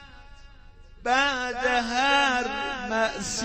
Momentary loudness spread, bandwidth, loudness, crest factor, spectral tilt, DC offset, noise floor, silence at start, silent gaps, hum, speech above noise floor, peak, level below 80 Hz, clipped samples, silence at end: 8 LU; 15.5 kHz; -24 LUFS; 18 dB; -2 dB/octave; under 0.1%; -48 dBFS; 0 s; none; none; 23 dB; -8 dBFS; -48 dBFS; under 0.1%; 0 s